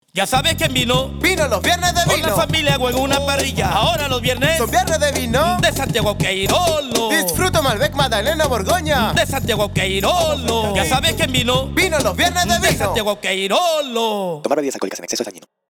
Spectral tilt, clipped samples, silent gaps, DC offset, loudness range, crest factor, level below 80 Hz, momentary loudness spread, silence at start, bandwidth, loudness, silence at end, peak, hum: -3.5 dB/octave; under 0.1%; none; under 0.1%; 1 LU; 14 dB; -34 dBFS; 4 LU; 0.15 s; over 20 kHz; -17 LUFS; 0.3 s; -4 dBFS; none